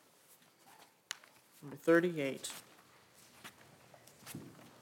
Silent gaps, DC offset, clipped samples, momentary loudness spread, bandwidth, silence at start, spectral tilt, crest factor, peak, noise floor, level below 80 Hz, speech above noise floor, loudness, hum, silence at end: none; under 0.1%; under 0.1%; 26 LU; 17 kHz; 1.1 s; -4.5 dB/octave; 24 dB; -18 dBFS; -65 dBFS; -86 dBFS; 32 dB; -36 LUFS; none; 0.15 s